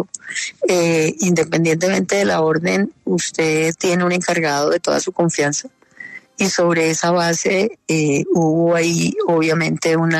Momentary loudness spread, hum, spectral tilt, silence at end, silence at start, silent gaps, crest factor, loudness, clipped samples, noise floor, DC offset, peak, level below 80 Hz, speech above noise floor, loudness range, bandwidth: 5 LU; none; -4.5 dB/octave; 0 s; 0 s; none; 12 dB; -17 LUFS; under 0.1%; -37 dBFS; under 0.1%; -4 dBFS; -58 dBFS; 21 dB; 2 LU; 13.5 kHz